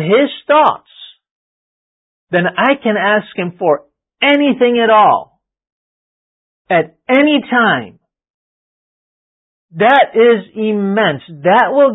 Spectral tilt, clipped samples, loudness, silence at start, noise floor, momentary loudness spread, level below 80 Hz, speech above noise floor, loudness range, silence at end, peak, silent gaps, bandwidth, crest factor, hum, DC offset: -8 dB/octave; under 0.1%; -12 LUFS; 0 s; under -90 dBFS; 8 LU; -66 dBFS; over 78 dB; 3 LU; 0 s; 0 dBFS; 1.31-2.27 s, 5.72-6.65 s, 8.30-9.69 s; 4 kHz; 14 dB; none; under 0.1%